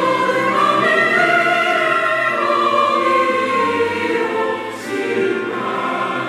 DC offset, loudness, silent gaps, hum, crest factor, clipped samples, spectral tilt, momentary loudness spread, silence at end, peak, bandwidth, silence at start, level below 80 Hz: under 0.1%; -16 LUFS; none; none; 14 dB; under 0.1%; -4 dB/octave; 8 LU; 0 s; -2 dBFS; 15.5 kHz; 0 s; -66 dBFS